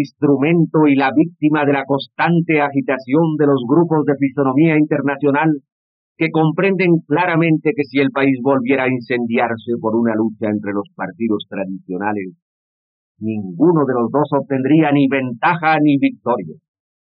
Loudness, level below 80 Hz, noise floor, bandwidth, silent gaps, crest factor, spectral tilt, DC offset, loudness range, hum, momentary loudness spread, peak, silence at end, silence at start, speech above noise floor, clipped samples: -16 LUFS; -80 dBFS; under -90 dBFS; 5.4 kHz; 5.72-6.16 s, 12.42-13.15 s; 12 dB; -6 dB/octave; under 0.1%; 5 LU; none; 9 LU; -4 dBFS; 0.55 s; 0 s; over 74 dB; under 0.1%